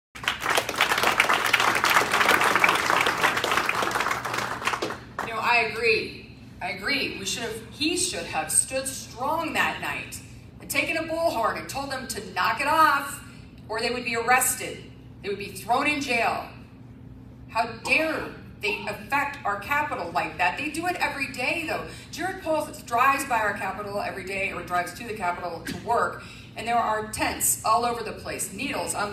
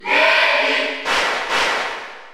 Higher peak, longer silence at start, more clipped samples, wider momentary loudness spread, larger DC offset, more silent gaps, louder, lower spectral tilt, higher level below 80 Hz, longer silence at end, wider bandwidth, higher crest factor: about the same, -4 dBFS vs -2 dBFS; first, 0.15 s vs 0 s; neither; first, 13 LU vs 10 LU; neither; neither; second, -25 LUFS vs -16 LUFS; first, -2 dB/octave vs -0.5 dB/octave; about the same, -54 dBFS vs -54 dBFS; about the same, 0 s vs 0 s; about the same, 16 kHz vs 17 kHz; first, 24 dB vs 16 dB